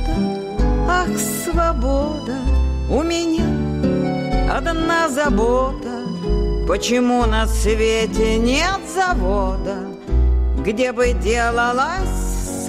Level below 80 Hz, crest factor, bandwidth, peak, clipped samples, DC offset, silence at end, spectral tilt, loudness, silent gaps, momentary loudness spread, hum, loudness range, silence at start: -22 dBFS; 10 dB; 15.5 kHz; -8 dBFS; under 0.1%; under 0.1%; 0 s; -5 dB/octave; -19 LUFS; none; 6 LU; none; 2 LU; 0 s